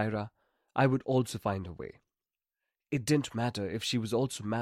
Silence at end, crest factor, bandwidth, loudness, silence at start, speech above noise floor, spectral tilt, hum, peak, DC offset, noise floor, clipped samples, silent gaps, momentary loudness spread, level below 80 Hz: 0 s; 18 dB; 16 kHz; -32 LUFS; 0 s; over 59 dB; -5.5 dB/octave; none; -14 dBFS; under 0.1%; under -90 dBFS; under 0.1%; none; 13 LU; -64 dBFS